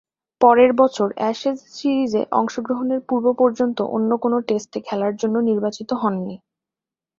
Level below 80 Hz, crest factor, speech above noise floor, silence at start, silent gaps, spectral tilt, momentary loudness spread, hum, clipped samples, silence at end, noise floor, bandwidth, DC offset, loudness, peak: -64 dBFS; 18 dB; 70 dB; 0.4 s; none; -6 dB/octave; 9 LU; none; under 0.1%; 0.85 s; -89 dBFS; 7.6 kHz; under 0.1%; -20 LUFS; -2 dBFS